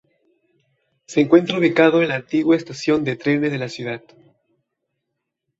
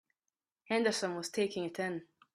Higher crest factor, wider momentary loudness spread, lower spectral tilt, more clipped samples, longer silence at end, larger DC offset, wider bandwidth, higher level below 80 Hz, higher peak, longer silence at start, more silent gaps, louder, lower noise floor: about the same, 18 dB vs 18 dB; first, 12 LU vs 7 LU; first, -6 dB/octave vs -4 dB/octave; neither; first, 1.6 s vs 0.3 s; neither; second, 7.8 kHz vs 14 kHz; first, -62 dBFS vs -80 dBFS; first, -2 dBFS vs -18 dBFS; first, 1.1 s vs 0.7 s; neither; first, -19 LUFS vs -35 LUFS; second, -79 dBFS vs under -90 dBFS